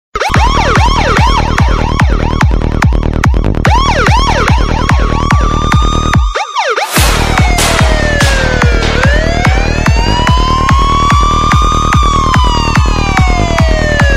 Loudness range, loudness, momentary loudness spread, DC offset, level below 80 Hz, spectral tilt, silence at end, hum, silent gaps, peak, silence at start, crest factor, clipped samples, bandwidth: 1 LU; -10 LUFS; 3 LU; 0.3%; -12 dBFS; -5 dB/octave; 0 s; none; none; 0 dBFS; 0.15 s; 8 dB; under 0.1%; 15.5 kHz